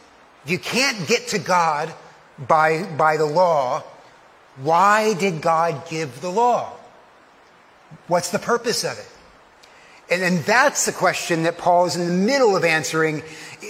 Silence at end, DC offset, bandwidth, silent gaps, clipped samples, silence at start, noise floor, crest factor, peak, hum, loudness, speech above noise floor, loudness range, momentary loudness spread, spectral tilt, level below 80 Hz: 0 s; under 0.1%; 16 kHz; none; under 0.1%; 0.45 s; -51 dBFS; 20 dB; -2 dBFS; none; -19 LUFS; 31 dB; 6 LU; 11 LU; -4 dB/octave; -66 dBFS